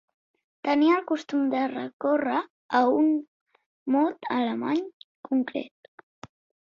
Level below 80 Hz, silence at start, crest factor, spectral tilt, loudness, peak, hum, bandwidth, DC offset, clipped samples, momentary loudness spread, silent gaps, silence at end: -74 dBFS; 0.65 s; 18 dB; -6 dB/octave; -26 LUFS; -8 dBFS; none; 7.2 kHz; under 0.1%; under 0.1%; 11 LU; 1.93-2.00 s, 2.50-2.69 s, 3.28-3.46 s, 3.66-3.86 s, 4.93-5.23 s; 0.95 s